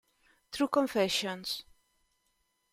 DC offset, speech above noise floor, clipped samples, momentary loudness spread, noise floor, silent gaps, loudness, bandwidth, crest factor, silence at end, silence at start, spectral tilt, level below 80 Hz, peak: under 0.1%; 46 dB; under 0.1%; 10 LU; -77 dBFS; none; -31 LUFS; 16 kHz; 22 dB; 1.1 s; 0.5 s; -3.5 dB/octave; -70 dBFS; -14 dBFS